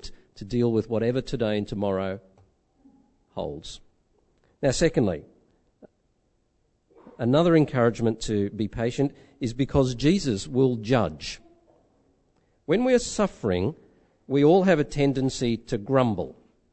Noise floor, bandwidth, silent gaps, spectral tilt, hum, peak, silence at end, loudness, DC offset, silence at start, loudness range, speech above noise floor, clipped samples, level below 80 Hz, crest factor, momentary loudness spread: -69 dBFS; 8.6 kHz; none; -6.5 dB/octave; none; -6 dBFS; 0.4 s; -25 LUFS; under 0.1%; 0 s; 6 LU; 46 dB; under 0.1%; -46 dBFS; 20 dB; 16 LU